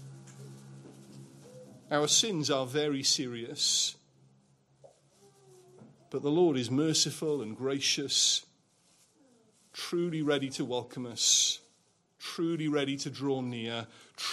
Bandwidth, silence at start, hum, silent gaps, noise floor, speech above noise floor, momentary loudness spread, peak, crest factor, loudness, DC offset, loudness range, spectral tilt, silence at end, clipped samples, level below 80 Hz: 15.5 kHz; 0 s; none; none; -70 dBFS; 39 dB; 17 LU; -10 dBFS; 22 dB; -29 LUFS; under 0.1%; 4 LU; -2.5 dB/octave; 0 s; under 0.1%; -80 dBFS